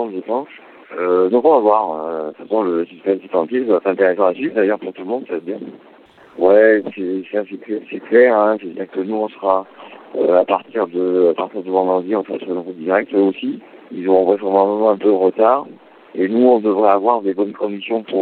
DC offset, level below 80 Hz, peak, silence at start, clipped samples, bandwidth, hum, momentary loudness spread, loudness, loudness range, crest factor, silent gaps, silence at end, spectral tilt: under 0.1%; -74 dBFS; 0 dBFS; 0 s; under 0.1%; 4.4 kHz; none; 13 LU; -17 LUFS; 3 LU; 16 dB; none; 0 s; -9 dB/octave